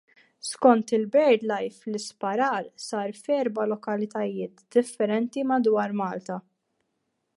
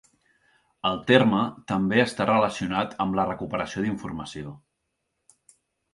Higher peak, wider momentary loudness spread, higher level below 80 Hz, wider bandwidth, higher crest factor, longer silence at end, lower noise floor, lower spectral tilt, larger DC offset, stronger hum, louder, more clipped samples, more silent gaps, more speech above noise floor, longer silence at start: about the same, -4 dBFS vs -4 dBFS; about the same, 13 LU vs 15 LU; second, -80 dBFS vs -56 dBFS; about the same, 11.5 kHz vs 11.5 kHz; about the same, 22 dB vs 22 dB; second, 0.95 s vs 1.35 s; about the same, -77 dBFS vs -79 dBFS; about the same, -5 dB/octave vs -6 dB/octave; neither; neither; about the same, -26 LUFS vs -24 LUFS; neither; neither; about the same, 52 dB vs 54 dB; second, 0.45 s vs 0.85 s